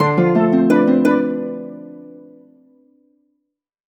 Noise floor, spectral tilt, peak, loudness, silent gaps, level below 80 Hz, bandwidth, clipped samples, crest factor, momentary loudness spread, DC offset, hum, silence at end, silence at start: -76 dBFS; -8.5 dB/octave; -2 dBFS; -15 LUFS; none; -62 dBFS; 14 kHz; under 0.1%; 16 dB; 22 LU; under 0.1%; none; 1.7 s; 0 s